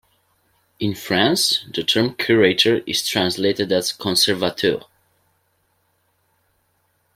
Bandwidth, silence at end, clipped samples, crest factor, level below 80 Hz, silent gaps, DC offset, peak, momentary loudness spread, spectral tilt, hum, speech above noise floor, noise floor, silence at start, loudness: 16.5 kHz; 2.35 s; under 0.1%; 20 dB; -60 dBFS; none; under 0.1%; -2 dBFS; 6 LU; -3.5 dB/octave; none; 47 dB; -66 dBFS; 0.8 s; -18 LUFS